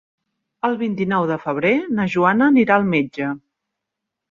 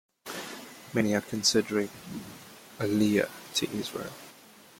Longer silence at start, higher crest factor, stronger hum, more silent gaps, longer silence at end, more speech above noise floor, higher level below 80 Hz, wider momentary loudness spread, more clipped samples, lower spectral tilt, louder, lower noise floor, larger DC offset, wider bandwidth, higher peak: first, 0.65 s vs 0.25 s; about the same, 18 dB vs 20 dB; neither; neither; first, 0.9 s vs 0.45 s; first, 64 dB vs 25 dB; first, -60 dBFS vs -66 dBFS; second, 10 LU vs 20 LU; neither; first, -8 dB/octave vs -4 dB/octave; first, -18 LUFS vs -29 LUFS; first, -82 dBFS vs -53 dBFS; neither; second, 7.2 kHz vs 16.5 kHz; first, -2 dBFS vs -12 dBFS